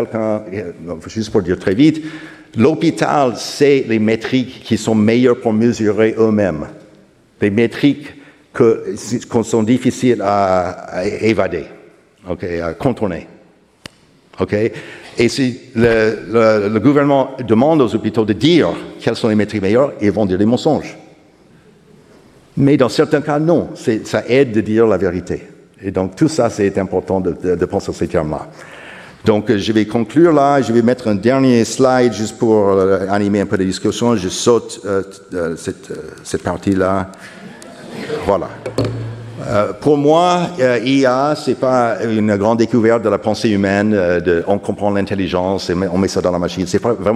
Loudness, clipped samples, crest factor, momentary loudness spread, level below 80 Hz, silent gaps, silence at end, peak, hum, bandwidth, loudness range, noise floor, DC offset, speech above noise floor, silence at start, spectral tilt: -15 LUFS; under 0.1%; 16 dB; 13 LU; -46 dBFS; none; 0 s; 0 dBFS; none; 13.5 kHz; 6 LU; -48 dBFS; under 0.1%; 34 dB; 0 s; -6 dB/octave